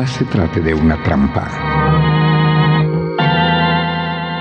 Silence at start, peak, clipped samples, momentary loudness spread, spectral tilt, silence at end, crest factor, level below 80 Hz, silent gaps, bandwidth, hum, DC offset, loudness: 0 s; -4 dBFS; under 0.1%; 5 LU; -7.5 dB/octave; 0 s; 10 dB; -30 dBFS; none; 7 kHz; none; under 0.1%; -14 LUFS